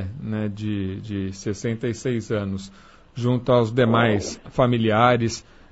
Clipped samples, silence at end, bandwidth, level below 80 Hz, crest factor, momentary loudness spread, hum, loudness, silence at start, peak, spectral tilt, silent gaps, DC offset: under 0.1%; 0.3 s; 8 kHz; -50 dBFS; 18 dB; 11 LU; none; -23 LUFS; 0 s; -4 dBFS; -6.5 dB/octave; none; under 0.1%